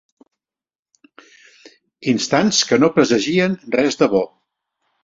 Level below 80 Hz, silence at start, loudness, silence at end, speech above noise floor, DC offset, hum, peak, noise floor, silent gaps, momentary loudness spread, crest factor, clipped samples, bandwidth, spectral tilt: -58 dBFS; 2 s; -17 LUFS; 0.75 s; over 74 dB; under 0.1%; none; -2 dBFS; under -90 dBFS; none; 7 LU; 18 dB; under 0.1%; 7.8 kHz; -4 dB/octave